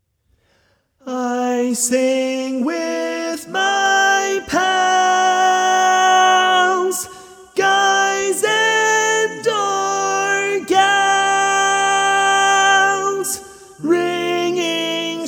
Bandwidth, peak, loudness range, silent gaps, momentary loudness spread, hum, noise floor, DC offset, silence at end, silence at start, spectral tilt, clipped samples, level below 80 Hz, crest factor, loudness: 18.5 kHz; 0 dBFS; 3 LU; none; 9 LU; none; -62 dBFS; under 0.1%; 0 s; 1.05 s; -1 dB/octave; under 0.1%; -62 dBFS; 16 dB; -16 LUFS